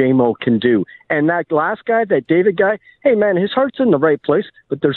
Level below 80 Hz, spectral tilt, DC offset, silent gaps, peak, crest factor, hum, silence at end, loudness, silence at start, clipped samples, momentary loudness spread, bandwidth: -60 dBFS; -10.5 dB/octave; under 0.1%; none; -2 dBFS; 12 dB; none; 0 s; -16 LUFS; 0 s; under 0.1%; 5 LU; 4.3 kHz